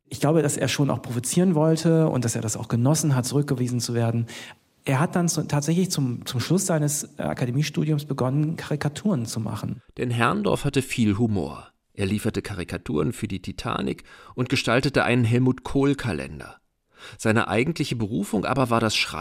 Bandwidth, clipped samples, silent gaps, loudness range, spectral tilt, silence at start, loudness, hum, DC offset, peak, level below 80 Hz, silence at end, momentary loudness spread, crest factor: 16 kHz; under 0.1%; none; 4 LU; -5.5 dB/octave; 0.1 s; -24 LUFS; none; under 0.1%; -4 dBFS; -50 dBFS; 0 s; 10 LU; 20 dB